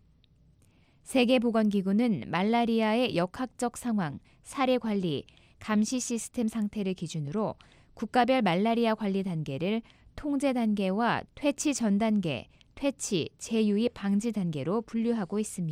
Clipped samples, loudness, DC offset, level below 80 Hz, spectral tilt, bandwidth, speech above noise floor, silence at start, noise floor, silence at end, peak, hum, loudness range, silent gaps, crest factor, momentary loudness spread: under 0.1%; -29 LUFS; under 0.1%; -60 dBFS; -5.5 dB/octave; 15 kHz; 34 dB; 1.05 s; -62 dBFS; 0 s; -12 dBFS; none; 3 LU; none; 18 dB; 8 LU